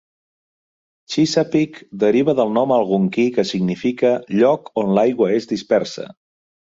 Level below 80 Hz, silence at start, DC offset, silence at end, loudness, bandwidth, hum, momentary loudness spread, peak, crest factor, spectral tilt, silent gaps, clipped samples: -60 dBFS; 1.1 s; under 0.1%; 0.6 s; -18 LUFS; 7.8 kHz; none; 5 LU; -2 dBFS; 16 dB; -6 dB/octave; none; under 0.1%